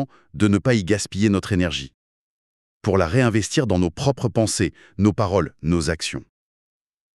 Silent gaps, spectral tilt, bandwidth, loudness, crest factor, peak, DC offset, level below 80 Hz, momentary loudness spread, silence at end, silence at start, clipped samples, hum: 1.94-2.81 s; -5.5 dB/octave; 12.5 kHz; -21 LUFS; 18 dB; -4 dBFS; under 0.1%; -44 dBFS; 9 LU; 0.95 s; 0 s; under 0.1%; none